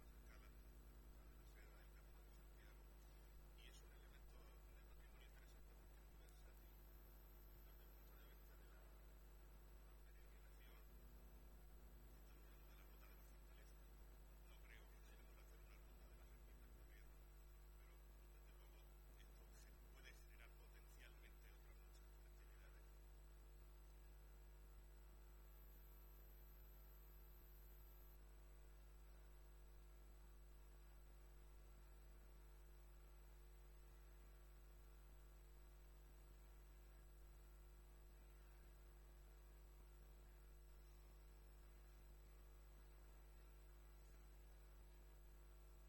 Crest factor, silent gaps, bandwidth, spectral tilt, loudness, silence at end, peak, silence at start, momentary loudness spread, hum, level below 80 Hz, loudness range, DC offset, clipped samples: 14 dB; none; 17.5 kHz; -5 dB/octave; -67 LUFS; 0 s; -50 dBFS; 0 s; 2 LU; 50 Hz at -65 dBFS; -64 dBFS; 1 LU; under 0.1%; under 0.1%